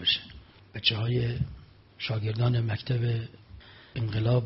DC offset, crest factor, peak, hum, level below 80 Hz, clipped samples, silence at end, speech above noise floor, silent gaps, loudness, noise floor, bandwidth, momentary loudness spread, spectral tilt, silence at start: under 0.1%; 20 dB; -8 dBFS; none; -50 dBFS; under 0.1%; 0 s; 22 dB; none; -29 LUFS; -50 dBFS; 5.8 kHz; 18 LU; -9.5 dB/octave; 0 s